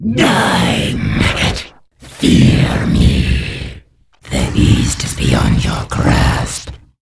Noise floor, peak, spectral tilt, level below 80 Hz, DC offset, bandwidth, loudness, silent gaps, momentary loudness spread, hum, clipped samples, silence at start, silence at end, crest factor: -43 dBFS; 0 dBFS; -5 dB/octave; -22 dBFS; under 0.1%; 11 kHz; -13 LUFS; none; 12 LU; none; under 0.1%; 0 s; 0.25 s; 14 dB